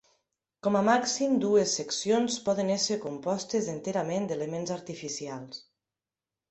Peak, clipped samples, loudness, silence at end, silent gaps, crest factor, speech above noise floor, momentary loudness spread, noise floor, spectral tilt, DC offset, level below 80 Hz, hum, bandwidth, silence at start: -10 dBFS; under 0.1%; -29 LUFS; 0.9 s; none; 18 dB; over 62 dB; 12 LU; under -90 dBFS; -4 dB/octave; under 0.1%; -70 dBFS; none; 8.4 kHz; 0.65 s